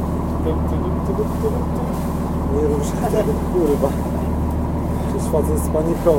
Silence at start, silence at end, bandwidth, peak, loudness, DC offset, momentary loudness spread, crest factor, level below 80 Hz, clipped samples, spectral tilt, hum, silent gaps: 0 s; 0 s; 16.5 kHz; -2 dBFS; -20 LUFS; under 0.1%; 4 LU; 16 dB; -28 dBFS; under 0.1%; -8 dB/octave; none; none